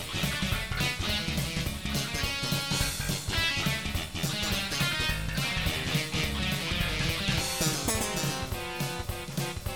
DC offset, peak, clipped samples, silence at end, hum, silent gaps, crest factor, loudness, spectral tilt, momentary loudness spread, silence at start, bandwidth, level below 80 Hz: 0.2%; -14 dBFS; under 0.1%; 0 s; none; none; 16 dB; -29 LUFS; -3 dB/octave; 6 LU; 0 s; 17.5 kHz; -40 dBFS